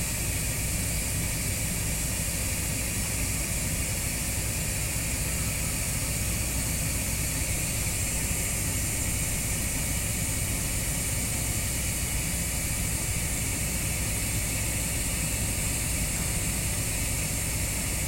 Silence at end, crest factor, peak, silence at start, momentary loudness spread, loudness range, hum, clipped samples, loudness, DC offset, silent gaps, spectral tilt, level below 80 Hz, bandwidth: 0 s; 14 dB; -14 dBFS; 0 s; 1 LU; 1 LU; none; under 0.1%; -27 LUFS; under 0.1%; none; -3 dB/octave; -36 dBFS; 16.5 kHz